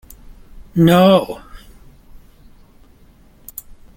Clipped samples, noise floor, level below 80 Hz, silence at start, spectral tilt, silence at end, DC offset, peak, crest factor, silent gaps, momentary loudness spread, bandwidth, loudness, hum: under 0.1%; -47 dBFS; -44 dBFS; 0.75 s; -7 dB/octave; 2.4 s; under 0.1%; 0 dBFS; 18 dB; none; 24 LU; 17 kHz; -13 LUFS; none